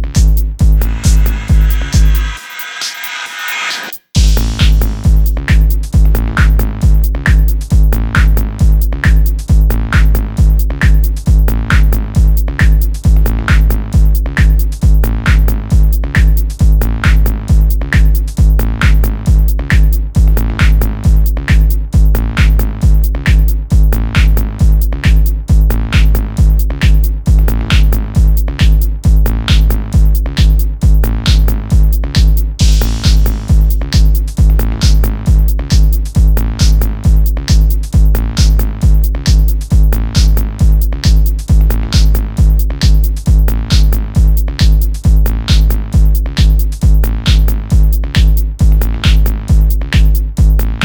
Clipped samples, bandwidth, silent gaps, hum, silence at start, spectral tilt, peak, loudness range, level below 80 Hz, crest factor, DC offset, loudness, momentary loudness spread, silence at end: under 0.1%; 20 kHz; none; none; 0 s; -5.5 dB/octave; 0 dBFS; 0 LU; -10 dBFS; 8 dB; under 0.1%; -12 LUFS; 1 LU; 0 s